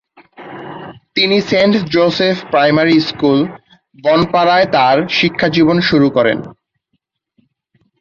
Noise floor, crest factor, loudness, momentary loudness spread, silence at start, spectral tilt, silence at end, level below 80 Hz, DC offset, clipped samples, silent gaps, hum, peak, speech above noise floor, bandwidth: -68 dBFS; 14 dB; -13 LUFS; 12 LU; 0.4 s; -6.5 dB/octave; 1.5 s; -50 dBFS; under 0.1%; under 0.1%; none; none; 0 dBFS; 56 dB; 7.2 kHz